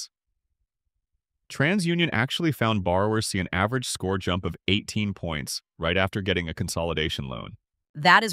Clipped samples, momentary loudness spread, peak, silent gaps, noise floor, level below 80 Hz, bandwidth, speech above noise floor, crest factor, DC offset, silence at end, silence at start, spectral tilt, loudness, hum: under 0.1%; 9 LU; -2 dBFS; 7.89-7.94 s; -81 dBFS; -48 dBFS; 16 kHz; 56 dB; 24 dB; under 0.1%; 0 s; 0 s; -4.5 dB/octave; -25 LUFS; none